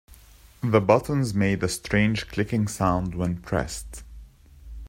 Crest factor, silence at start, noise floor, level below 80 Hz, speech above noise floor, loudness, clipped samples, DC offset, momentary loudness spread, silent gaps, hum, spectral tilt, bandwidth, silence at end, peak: 22 dB; 0.1 s; -51 dBFS; -44 dBFS; 27 dB; -24 LUFS; under 0.1%; under 0.1%; 12 LU; none; none; -6 dB/octave; 16 kHz; 0 s; -2 dBFS